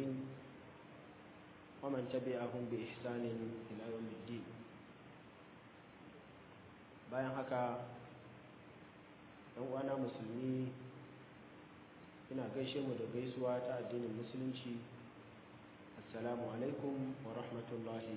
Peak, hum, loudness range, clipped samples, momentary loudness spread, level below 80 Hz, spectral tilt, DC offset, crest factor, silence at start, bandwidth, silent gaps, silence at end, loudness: -28 dBFS; none; 5 LU; under 0.1%; 18 LU; -78 dBFS; -6 dB/octave; under 0.1%; 18 dB; 0 s; 4 kHz; none; 0 s; -44 LUFS